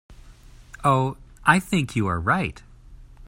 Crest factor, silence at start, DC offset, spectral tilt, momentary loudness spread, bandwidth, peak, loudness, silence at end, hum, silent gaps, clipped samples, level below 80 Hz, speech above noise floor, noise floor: 24 dB; 0.1 s; under 0.1%; -6 dB/octave; 6 LU; 16 kHz; 0 dBFS; -23 LUFS; 0 s; none; none; under 0.1%; -46 dBFS; 25 dB; -47 dBFS